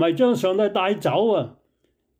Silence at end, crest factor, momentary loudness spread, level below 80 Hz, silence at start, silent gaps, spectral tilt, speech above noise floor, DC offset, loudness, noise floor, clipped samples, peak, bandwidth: 0.7 s; 14 dB; 5 LU; -68 dBFS; 0 s; none; -6 dB/octave; 49 dB; under 0.1%; -21 LUFS; -69 dBFS; under 0.1%; -8 dBFS; 16 kHz